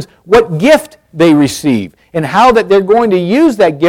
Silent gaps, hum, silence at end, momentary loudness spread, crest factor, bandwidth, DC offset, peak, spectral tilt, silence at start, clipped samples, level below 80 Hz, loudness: none; none; 0 s; 8 LU; 10 dB; 16.5 kHz; under 0.1%; 0 dBFS; -6 dB/octave; 0 s; under 0.1%; -40 dBFS; -10 LUFS